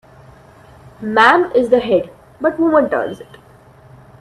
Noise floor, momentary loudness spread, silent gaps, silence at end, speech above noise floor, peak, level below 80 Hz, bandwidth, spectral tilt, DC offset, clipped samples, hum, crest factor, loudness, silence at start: -45 dBFS; 17 LU; none; 0.95 s; 30 dB; 0 dBFS; -52 dBFS; 12 kHz; -5.5 dB/octave; under 0.1%; under 0.1%; none; 18 dB; -15 LUFS; 1 s